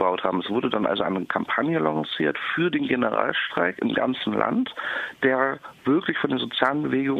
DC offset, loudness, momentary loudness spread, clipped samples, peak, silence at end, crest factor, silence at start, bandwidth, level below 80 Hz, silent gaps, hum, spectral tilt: under 0.1%; -24 LUFS; 3 LU; under 0.1%; -4 dBFS; 0 s; 20 dB; 0 s; 6.8 kHz; -64 dBFS; none; none; -7 dB/octave